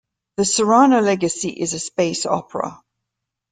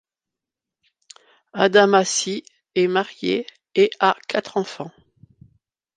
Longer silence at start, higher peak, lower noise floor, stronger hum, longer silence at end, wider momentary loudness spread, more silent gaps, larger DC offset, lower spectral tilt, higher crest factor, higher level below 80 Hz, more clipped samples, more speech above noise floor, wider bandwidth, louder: second, 0.4 s vs 1.55 s; about the same, -2 dBFS vs -2 dBFS; second, -81 dBFS vs -87 dBFS; neither; second, 0.75 s vs 1.1 s; about the same, 14 LU vs 16 LU; neither; neither; about the same, -4 dB/octave vs -3.5 dB/octave; about the same, 16 dB vs 20 dB; first, -60 dBFS vs -70 dBFS; neither; second, 63 dB vs 67 dB; about the same, 9.6 kHz vs 9.6 kHz; about the same, -18 LUFS vs -20 LUFS